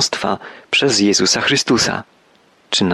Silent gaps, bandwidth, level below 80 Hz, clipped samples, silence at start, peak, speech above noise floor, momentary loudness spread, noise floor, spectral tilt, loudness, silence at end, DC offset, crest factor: none; 13 kHz; -52 dBFS; under 0.1%; 0 s; -4 dBFS; 36 dB; 9 LU; -53 dBFS; -2.5 dB/octave; -15 LUFS; 0 s; under 0.1%; 14 dB